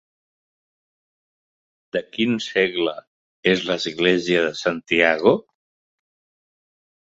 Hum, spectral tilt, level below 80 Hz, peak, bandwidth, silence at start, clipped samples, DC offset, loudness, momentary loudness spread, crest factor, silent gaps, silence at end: none; -4.5 dB/octave; -62 dBFS; -2 dBFS; 8 kHz; 1.95 s; under 0.1%; under 0.1%; -21 LUFS; 9 LU; 22 dB; 3.07-3.43 s; 1.6 s